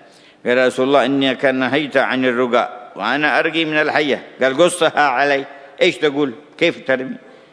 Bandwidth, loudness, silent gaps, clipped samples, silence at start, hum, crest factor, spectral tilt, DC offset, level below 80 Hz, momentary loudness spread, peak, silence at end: 11 kHz; -17 LUFS; none; under 0.1%; 0.45 s; none; 18 dB; -4 dB/octave; under 0.1%; -70 dBFS; 7 LU; 0 dBFS; 0.35 s